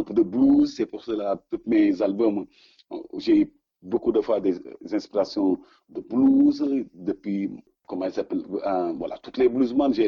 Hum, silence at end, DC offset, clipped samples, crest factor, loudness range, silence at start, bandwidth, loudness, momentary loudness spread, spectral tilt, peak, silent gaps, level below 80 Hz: none; 0 s; under 0.1%; under 0.1%; 14 dB; 2 LU; 0 s; 6.8 kHz; -24 LUFS; 14 LU; -7.5 dB/octave; -10 dBFS; none; -58 dBFS